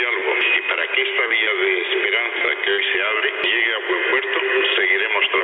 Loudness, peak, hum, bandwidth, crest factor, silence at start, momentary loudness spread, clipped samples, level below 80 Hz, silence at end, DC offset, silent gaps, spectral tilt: -18 LUFS; -6 dBFS; none; 4.5 kHz; 14 dB; 0 s; 2 LU; under 0.1%; -74 dBFS; 0 s; under 0.1%; none; -3.5 dB/octave